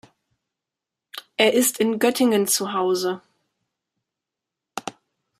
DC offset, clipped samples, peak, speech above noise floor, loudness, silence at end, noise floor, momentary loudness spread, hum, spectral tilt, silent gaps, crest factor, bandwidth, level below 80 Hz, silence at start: under 0.1%; under 0.1%; -2 dBFS; 66 dB; -20 LUFS; 0.5 s; -86 dBFS; 19 LU; none; -3 dB/octave; none; 22 dB; 15.5 kHz; -72 dBFS; 1.15 s